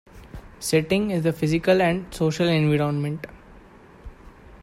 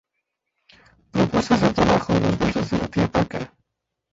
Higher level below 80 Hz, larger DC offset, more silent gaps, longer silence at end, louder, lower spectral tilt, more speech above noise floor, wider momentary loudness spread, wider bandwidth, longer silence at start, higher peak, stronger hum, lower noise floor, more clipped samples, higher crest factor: second, -48 dBFS vs -42 dBFS; neither; neither; second, 0.05 s vs 0.65 s; about the same, -22 LUFS vs -21 LUFS; about the same, -6 dB/octave vs -6.5 dB/octave; second, 26 dB vs 60 dB; first, 20 LU vs 10 LU; first, 15.5 kHz vs 8 kHz; second, 0.15 s vs 1.15 s; about the same, -6 dBFS vs -4 dBFS; neither; second, -48 dBFS vs -80 dBFS; neither; about the same, 18 dB vs 20 dB